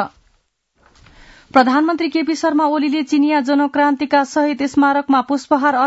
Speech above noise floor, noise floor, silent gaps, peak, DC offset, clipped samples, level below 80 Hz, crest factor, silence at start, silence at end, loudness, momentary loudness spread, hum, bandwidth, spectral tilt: 48 dB; -63 dBFS; none; 0 dBFS; under 0.1%; under 0.1%; -58 dBFS; 16 dB; 0 s; 0 s; -16 LUFS; 4 LU; none; 8 kHz; -4 dB/octave